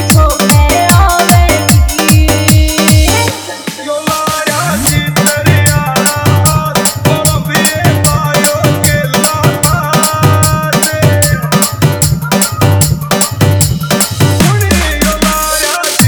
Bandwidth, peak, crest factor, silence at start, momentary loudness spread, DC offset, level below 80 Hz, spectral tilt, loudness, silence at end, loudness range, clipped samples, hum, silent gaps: over 20 kHz; 0 dBFS; 10 dB; 0 s; 4 LU; under 0.1%; -20 dBFS; -4 dB/octave; -9 LUFS; 0 s; 2 LU; 0.8%; none; none